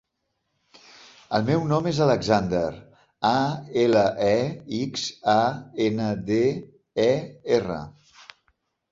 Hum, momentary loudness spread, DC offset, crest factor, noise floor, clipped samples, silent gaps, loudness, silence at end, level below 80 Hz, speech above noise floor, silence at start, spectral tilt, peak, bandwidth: none; 9 LU; under 0.1%; 20 dB; -77 dBFS; under 0.1%; none; -24 LUFS; 1 s; -54 dBFS; 54 dB; 1.3 s; -6 dB/octave; -4 dBFS; 7.8 kHz